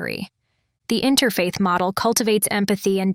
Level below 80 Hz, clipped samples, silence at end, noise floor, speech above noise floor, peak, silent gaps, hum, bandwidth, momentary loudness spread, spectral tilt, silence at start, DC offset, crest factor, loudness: -56 dBFS; under 0.1%; 0 s; -71 dBFS; 51 dB; -4 dBFS; none; none; 18 kHz; 13 LU; -4 dB/octave; 0 s; under 0.1%; 16 dB; -20 LUFS